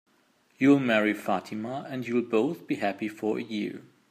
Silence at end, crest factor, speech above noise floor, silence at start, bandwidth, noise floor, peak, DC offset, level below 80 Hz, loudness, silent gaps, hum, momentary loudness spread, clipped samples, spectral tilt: 0.3 s; 20 dB; 39 dB; 0.6 s; 14.5 kHz; -66 dBFS; -8 dBFS; under 0.1%; -76 dBFS; -28 LUFS; none; none; 12 LU; under 0.1%; -6.5 dB/octave